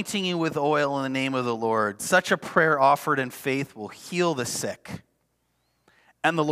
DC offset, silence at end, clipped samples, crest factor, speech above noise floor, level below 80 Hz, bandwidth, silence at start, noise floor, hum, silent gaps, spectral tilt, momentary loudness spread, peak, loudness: under 0.1%; 0 s; under 0.1%; 20 dB; 47 dB; -70 dBFS; 16 kHz; 0 s; -72 dBFS; none; none; -4 dB/octave; 12 LU; -4 dBFS; -24 LUFS